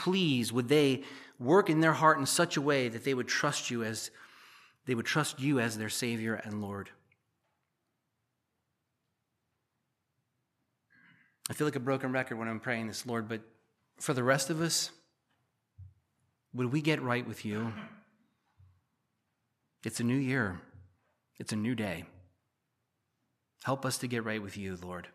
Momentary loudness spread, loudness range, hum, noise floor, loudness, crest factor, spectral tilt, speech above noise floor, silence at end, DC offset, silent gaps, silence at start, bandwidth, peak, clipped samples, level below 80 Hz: 14 LU; 11 LU; none; -83 dBFS; -32 LUFS; 24 dB; -4.5 dB/octave; 51 dB; 0.05 s; under 0.1%; none; 0 s; 15 kHz; -10 dBFS; under 0.1%; -76 dBFS